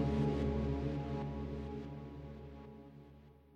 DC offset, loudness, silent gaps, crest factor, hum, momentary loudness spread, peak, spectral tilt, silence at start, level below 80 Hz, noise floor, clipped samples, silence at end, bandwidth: under 0.1%; -40 LUFS; none; 16 dB; none; 20 LU; -24 dBFS; -9 dB/octave; 0 s; -48 dBFS; -60 dBFS; under 0.1%; 0 s; 7.6 kHz